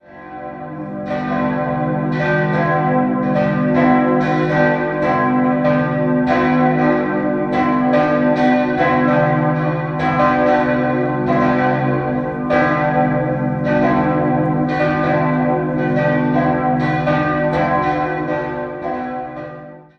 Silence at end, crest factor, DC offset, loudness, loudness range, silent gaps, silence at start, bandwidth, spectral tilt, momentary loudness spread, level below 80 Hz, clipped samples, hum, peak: 0.15 s; 16 dB; under 0.1%; -17 LUFS; 2 LU; none; 0.1 s; 6.2 kHz; -9 dB/octave; 9 LU; -44 dBFS; under 0.1%; none; 0 dBFS